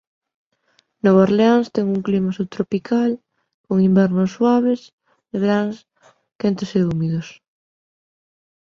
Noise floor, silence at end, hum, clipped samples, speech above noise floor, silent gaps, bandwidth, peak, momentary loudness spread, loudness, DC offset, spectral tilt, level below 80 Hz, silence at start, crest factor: -63 dBFS; 1.35 s; none; under 0.1%; 45 dB; 3.54-3.64 s, 4.93-4.98 s, 6.35-6.39 s; 7 kHz; -2 dBFS; 12 LU; -19 LUFS; under 0.1%; -8 dB/octave; -58 dBFS; 1.05 s; 18 dB